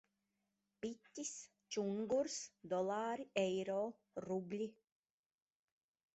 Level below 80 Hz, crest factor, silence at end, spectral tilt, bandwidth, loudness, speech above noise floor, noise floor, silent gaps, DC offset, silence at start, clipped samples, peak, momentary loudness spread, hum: -84 dBFS; 22 dB; 1.45 s; -4.5 dB/octave; 8 kHz; -43 LUFS; 46 dB; -88 dBFS; none; under 0.1%; 0.85 s; under 0.1%; -22 dBFS; 10 LU; none